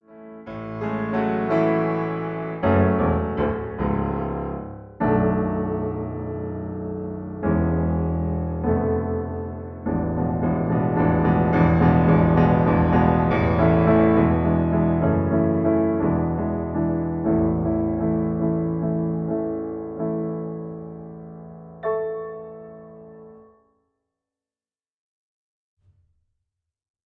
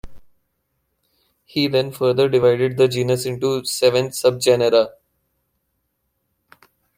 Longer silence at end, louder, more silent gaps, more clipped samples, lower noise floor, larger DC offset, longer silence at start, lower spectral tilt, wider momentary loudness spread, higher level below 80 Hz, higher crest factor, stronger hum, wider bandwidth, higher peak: first, 3.65 s vs 2.05 s; second, -22 LUFS vs -18 LUFS; neither; neither; first, under -90 dBFS vs -72 dBFS; neither; about the same, 0.1 s vs 0.05 s; first, -11 dB/octave vs -5 dB/octave; first, 15 LU vs 6 LU; first, -38 dBFS vs -54 dBFS; about the same, 18 dB vs 18 dB; neither; second, 4.3 kHz vs 16.5 kHz; about the same, -6 dBFS vs -4 dBFS